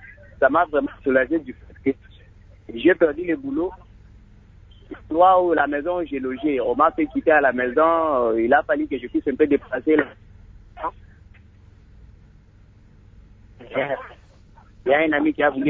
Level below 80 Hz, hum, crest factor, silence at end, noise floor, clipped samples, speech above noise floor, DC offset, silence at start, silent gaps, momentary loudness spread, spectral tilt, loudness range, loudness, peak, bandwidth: -50 dBFS; none; 18 dB; 0 s; -50 dBFS; under 0.1%; 30 dB; under 0.1%; 0.05 s; none; 14 LU; -8.5 dB/octave; 15 LU; -21 LUFS; -4 dBFS; 4 kHz